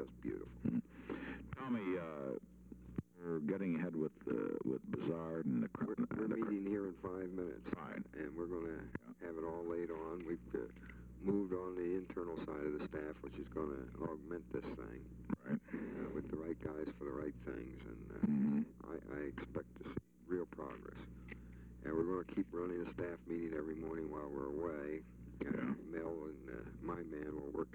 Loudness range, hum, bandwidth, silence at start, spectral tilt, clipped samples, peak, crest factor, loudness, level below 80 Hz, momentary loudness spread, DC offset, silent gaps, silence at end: 4 LU; none; 8.8 kHz; 0 s; -9 dB/octave; under 0.1%; -24 dBFS; 18 dB; -44 LUFS; -62 dBFS; 10 LU; under 0.1%; none; 0 s